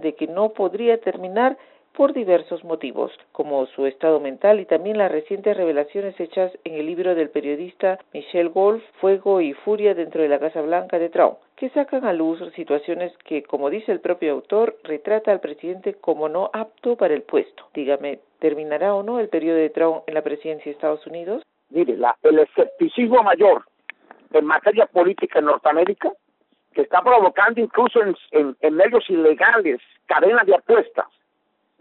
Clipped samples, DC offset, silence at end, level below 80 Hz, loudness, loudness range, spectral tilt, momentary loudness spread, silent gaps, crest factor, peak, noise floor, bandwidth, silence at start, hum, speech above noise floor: under 0.1%; under 0.1%; 0.75 s; -70 dBFS; -20 LUFS; 6 LU; -3 dB/octave; 12 LU; none; 18 dB; -2 dBFS; -70 dBFS; 4.2 kHz; 0 s; none; 50 dB